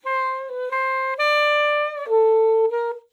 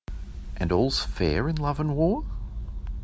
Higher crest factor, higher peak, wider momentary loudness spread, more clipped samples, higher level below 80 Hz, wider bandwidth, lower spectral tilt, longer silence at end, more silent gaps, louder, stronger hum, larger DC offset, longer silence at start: second, 10 dB vs 18 dB; about the same, -10 dBFS vs -8 dBFS; second, 9 LU vs 14 LU; neither; second, under -90 dBFS vs -34 dBFS; first, 12 kHz vs 8 kHz; second, 1 dB/octave vs -6.5 dB/octave; first, 0.15 s vs 0 s; neither; first, -20 LUFS vs -27 LUFS; neither; neither; about the same, 0.05 s vs 0.1 s